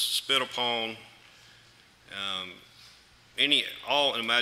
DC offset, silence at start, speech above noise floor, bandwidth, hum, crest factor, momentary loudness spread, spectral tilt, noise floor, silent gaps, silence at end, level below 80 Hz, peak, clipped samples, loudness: under 0.1%; 0 s; 29 dB; 16 kHz; none; 24 dB; 18 LU; -1 dB/octave; -58 dBFS; none; 0 s; -72 dBFS; -8 dBFS; under 0.1%; -27 LUFS